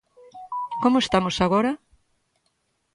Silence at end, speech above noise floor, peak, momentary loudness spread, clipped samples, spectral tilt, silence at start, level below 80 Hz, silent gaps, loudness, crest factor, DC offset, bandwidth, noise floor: 1.2 s; 51 dB; -6 dBFS; 13 LU; under 0.1%; -5.5 dB/octave; 0.35 s; -52 dBFS; none; -22 LUFS; 18 dB; under 0.1%; 11 kHz; -72 dBFS